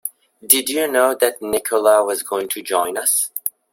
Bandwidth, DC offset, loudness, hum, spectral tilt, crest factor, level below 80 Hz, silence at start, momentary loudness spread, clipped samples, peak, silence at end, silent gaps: 16.5 kHz; under 0.1%; -17 LUFS; none; -0.5 dB/octave; 18 dB; -62 dBFS; 0.05 s; 8 LU; under 0.1%; 0 dBFS; 0.25 s; none